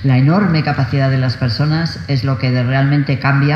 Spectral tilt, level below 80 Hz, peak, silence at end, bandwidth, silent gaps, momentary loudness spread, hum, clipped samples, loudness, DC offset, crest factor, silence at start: -8 dB/octave; -42 dBFS; 0 dBFS; 0 s; 6.4 kHz; none; 5 LU; none; under 0.1%; -15 LUFS; under 0.1%; 12 dB; 0 s